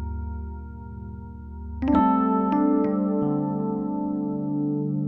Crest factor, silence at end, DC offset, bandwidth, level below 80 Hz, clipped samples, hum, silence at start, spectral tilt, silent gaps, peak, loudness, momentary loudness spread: 16 dB; 0 s; under 0.1%; 4.2 kHz; -40 dBFS; under 0.1%; none; 0 s; -11.5 dB/octave; none; -8 dBFS; -24 LUFS; 18 LU